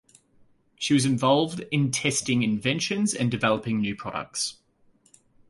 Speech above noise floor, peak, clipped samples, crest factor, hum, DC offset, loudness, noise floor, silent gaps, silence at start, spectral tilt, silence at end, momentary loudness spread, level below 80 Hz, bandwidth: 38 dB; -8 dBFS; under 0.1%; 18 dB; none; under 0.1%; -25 LUFS; -62 dBFS; none; 0.8 s; -4.5 dB/octave; 0.95 s; 8 LU; -60 dBFS; 11.5 kHz